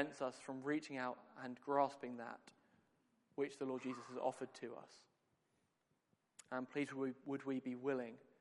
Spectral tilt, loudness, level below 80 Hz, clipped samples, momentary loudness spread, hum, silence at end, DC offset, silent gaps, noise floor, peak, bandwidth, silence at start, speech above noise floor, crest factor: -5.5 dB/octave; -45 LUFS; under -90 dBFS; under 0.1%; 12 LU; none; 0.2 s; under 0.1%; none; -84 dBFS; -22 dBFS; 11.5 kHz; 0 s; 39 dB; 24 dB